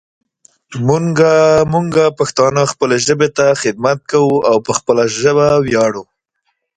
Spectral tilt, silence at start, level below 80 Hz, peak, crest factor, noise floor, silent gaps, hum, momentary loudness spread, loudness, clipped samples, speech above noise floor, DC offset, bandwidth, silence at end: -5 dB/octave; 0.7 s; -48 dBFS; 0 dBFS; 14 dB; -68 dBFS; none; none; 5 LU; -13 LUFS; under 0.1%; 56 dB; under 0.1%; 9.6 kHz; 0.75 s